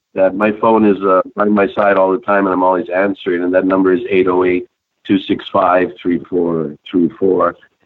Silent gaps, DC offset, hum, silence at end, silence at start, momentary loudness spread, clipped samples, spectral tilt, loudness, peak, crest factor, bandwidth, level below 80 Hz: none; under 0.1%; none; 0.3 s; 0.15 s; 6 LU; under 0.1%; -9.5 dB/octave; -14 LUFS; -2 dBFS; 12 dB; 4.5 kHz; -52 dBFS